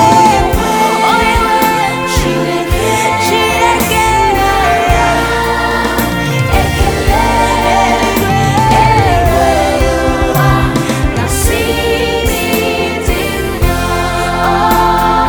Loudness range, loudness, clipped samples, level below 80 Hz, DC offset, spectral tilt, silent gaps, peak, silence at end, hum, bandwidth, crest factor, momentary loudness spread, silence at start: 3 LU; -11 LUFS; 0.2%; -20 dBFS; under 0.1%; -4.5 dB/octave; none; 0 dBFS; 0 s; none; over 20 kHz; 10 dB; 4 LU; 0 s